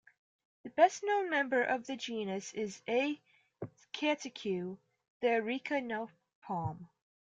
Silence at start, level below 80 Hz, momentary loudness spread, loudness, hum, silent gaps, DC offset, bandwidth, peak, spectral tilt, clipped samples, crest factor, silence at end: 0.65 s; -76 dBFS; 18 LU; -34 LUFS; none; 5.10-5.20 s, 6.35-6.42 s; under 0.1%; 9.4 kHz; -14 dBFS; -4.5 dB/octave; under 0.1%; 22 dB; 0.4 s